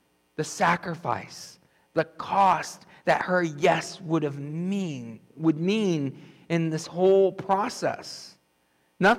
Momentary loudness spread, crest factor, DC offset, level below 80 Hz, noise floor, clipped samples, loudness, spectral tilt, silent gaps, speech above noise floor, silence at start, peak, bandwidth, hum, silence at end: 16 LU; 16 dB; under 0.1%; -66 dBFS; -68 dBFS; under 0.1%; -26 LUFS; -5.5 dB/octave; none; 42 dB; 0.4 s; -12 dBFS; 13.5 kHz; none; 0 s